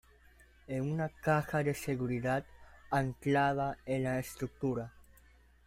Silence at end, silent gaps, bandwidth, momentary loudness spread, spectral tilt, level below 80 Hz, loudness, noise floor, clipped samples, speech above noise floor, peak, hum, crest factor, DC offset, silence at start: 0.65 s; none; 16 kHz; 8 LU; -6.5 dB/octave; -60 dBFS; -34 LUFS; -62 dBFS; under 0.1%; 29 dB; -18 dBFS; none; 18 dB; under 0.1%; 0.7 s